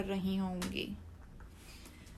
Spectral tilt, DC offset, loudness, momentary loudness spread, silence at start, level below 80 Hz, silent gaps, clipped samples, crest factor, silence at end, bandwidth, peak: -5.5 dB/octave; under 0.1%; -38 LUFS; 19 LU; 0 s; -54 dBFS; none; under 0.1%; 18 dB; 0 s; 14 kHz; -22 dBFS